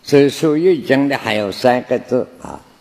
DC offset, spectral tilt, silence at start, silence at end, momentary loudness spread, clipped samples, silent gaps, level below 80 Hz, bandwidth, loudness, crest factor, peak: under 0.1%; -6 dB/octave; 0.05 s; 0.25 s; 12 LU; under 0.1%; none; -56 dBFS; 15 kHz; -15 LUFS; 16 dB; 0 dBFS